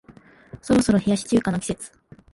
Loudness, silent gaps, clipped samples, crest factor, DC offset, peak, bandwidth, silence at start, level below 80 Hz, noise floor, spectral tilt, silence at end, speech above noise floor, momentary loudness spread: -22 LUFS; none; under 0.1%; 16 dB; under 0.1%; -6 dBFS; 11.5 kHz; 0.1 s; -48 dBFS; -50 dBFS; -5.5 dB/octave; 0.45 s; 29 dB; 18 LU